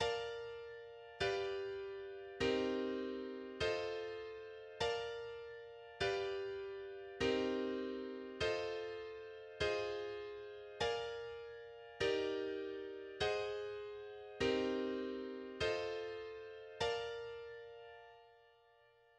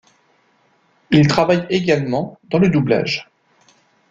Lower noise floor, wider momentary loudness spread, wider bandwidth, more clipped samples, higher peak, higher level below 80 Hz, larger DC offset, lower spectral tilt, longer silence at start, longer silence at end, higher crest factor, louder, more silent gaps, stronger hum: first, -69 dBFS vs -59 dBFS; first, 14 LU vs 9 LU; first, 10 kHz vs 7.6 kHz; neither; second, -26 dBFS vs -2 dBFS; second, -66 dBFS vs -52 dBFS; neither; second, -4.5 dB/octave vs -6.5 dB/octave; second, 0 s vs 1.1 s; second, 0.7 s vs 0.9 s; about the same, 18 dB vs 16 dB; second, -42 LUFS vs -17 LUFS; neither; neither